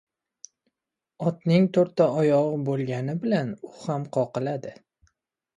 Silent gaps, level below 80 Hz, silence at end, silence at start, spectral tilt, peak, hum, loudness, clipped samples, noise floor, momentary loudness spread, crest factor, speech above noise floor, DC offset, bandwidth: none; -68 dBFS; 0.85 s; 1.2 s; -8 dB/octave; -8 dBFS; none; -25 LUFS; under 0.1%; -87 dBFS; 12 LU; 18 dB; 63 dB; under 0.1%; 11 kHz